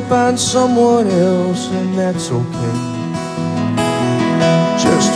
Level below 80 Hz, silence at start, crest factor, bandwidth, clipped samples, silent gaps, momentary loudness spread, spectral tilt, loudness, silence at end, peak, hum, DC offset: -50 dBFS; 0 s; 14 dB; 13.5 kHz; under 0.1%; none; 8 LU; -5 dB/octave; -15 LUFS; 0 s; 0 dBFS; none; under 0.1%